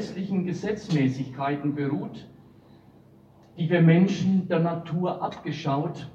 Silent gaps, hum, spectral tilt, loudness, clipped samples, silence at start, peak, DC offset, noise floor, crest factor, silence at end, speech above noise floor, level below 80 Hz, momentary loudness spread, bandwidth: none; none; -8 dB/octave; -25 LUFS; under 0.1%; 0 s; -8 dBFS; under 0.1%; -54 dBFS; 18 dB; 0.05 s; 29 dB; -64 dBFS; 12 LU; 7.4 kHz